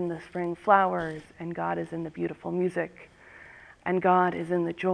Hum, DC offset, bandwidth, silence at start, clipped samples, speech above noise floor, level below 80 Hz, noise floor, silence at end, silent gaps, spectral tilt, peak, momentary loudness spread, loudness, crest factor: none; under 0.1%; 10 kHz; 0 s; under 0.1%; 23 dB; -64 dBFS; -50 dBFS; 0 s; none; -8 dB/octave; -6 dBFS; 15 LU; -28 LUFS; 22 dB